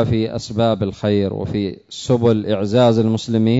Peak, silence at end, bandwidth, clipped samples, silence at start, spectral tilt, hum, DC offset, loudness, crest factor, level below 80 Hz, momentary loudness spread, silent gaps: -4 dBFS; 0 s; 8 kHz; under 0.1%; 0 s; -7 dB/octave; none; under 0.1%; -18 LUFS; 14 dB; -46 dBFS; 8 LU; none